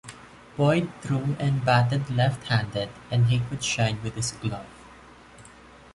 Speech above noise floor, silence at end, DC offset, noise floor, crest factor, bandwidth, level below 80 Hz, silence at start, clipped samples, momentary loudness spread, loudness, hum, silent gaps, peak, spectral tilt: 25 dB; 0.45 s; under 0.1%; -49 dBFS; 18 dB; 11.5 kHz; -52 dBFS; 0.05 s; under 0.1%; 11 LU; -25 LUFS; none; none; -8 dBFS; -5.5 dB/octave